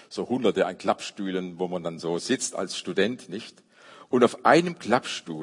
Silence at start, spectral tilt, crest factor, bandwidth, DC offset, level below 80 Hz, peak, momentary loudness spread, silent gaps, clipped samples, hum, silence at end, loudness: 0.1 s; -4.5 dB/octave; 22 dB; 11 kHz; under 0.1%; -74 dBFS; -4 dBFS; 11 LU; none; under 0.1%; none; 0 s; -26 LUFS